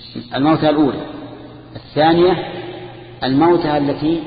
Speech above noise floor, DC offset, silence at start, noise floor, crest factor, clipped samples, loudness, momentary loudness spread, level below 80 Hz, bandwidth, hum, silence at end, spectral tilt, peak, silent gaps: 20 dB; under 0.1%; 0 s; -35 dBFS; 16 dB; under 0.1%; -16 LUFS; 21 LU; -46 dBFS; 5 kHz; none; 0 s; -12 dB/octave; -2 dBFS; none